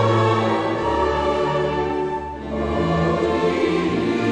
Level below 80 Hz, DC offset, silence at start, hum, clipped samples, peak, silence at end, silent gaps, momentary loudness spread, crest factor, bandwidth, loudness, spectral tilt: -38 dBFS; under 0.1%; 0 s; none; under 0.1%; -6 dBFS; 0 s; none; 6 LU; 14 dB; 10 kHz; -21 LUFS; -7 dB/octave